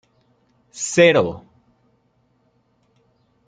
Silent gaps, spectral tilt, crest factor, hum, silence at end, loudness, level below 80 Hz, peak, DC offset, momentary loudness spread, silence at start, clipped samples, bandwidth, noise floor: none; -4 dB/octave; 22 dB; none; 2.1 s; -17 LUFS; -60 dBFS; -2 dBFS; under 0.1%; 25 LU; 0.75 s; under 0.1%; 9.6 kHz; -64 dBFS